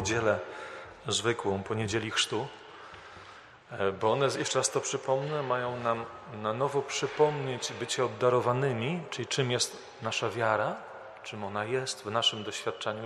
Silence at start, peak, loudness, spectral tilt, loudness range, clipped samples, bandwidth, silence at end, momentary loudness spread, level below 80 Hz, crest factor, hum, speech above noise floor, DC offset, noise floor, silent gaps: 0 s; -12 dBFS; -30 LUFS; -3.5 dB/octave; 2 LU; under 0.1%; 13 kHz; 0 s; 14 LU; -66 dBFS; 20 dB; none; 21 dB; under 0.1%; -51 dBFS; none